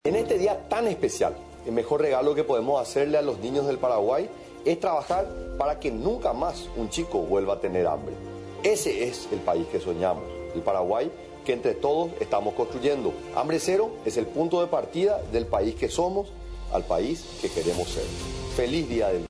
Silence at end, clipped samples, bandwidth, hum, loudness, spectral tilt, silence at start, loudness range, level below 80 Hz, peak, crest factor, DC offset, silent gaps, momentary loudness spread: 0.05 s; under 0.1%; 11 kHz; none; -27 LUFS; -5 dB/octave; 0.05 s; 3 LU; -44 dBFS; -12 dBFS; 14 dB; under 0.1%; none; 7 LU